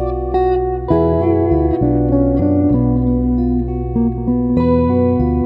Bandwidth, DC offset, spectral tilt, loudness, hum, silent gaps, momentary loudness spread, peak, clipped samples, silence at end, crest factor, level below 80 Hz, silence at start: 5 kHz; under 0.1%; -12.5 dB/octave; -15 LUFS; none; none; 4 LU; -2 dBFS; under 0.1%; 0 s; 12 dB; -24 dBFS; 0 s